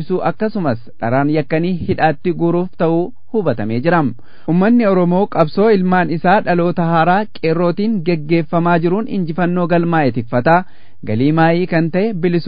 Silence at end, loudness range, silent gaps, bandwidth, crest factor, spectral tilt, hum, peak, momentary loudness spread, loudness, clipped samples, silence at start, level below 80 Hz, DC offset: 0 s; 3 LU; none; 5.2 kHz; 14 dB; -11 dB/octave; none; 0 dBFS; 6 LU; -15 LUFS; under 0.1%; 0 s; -48 dBFS; 5%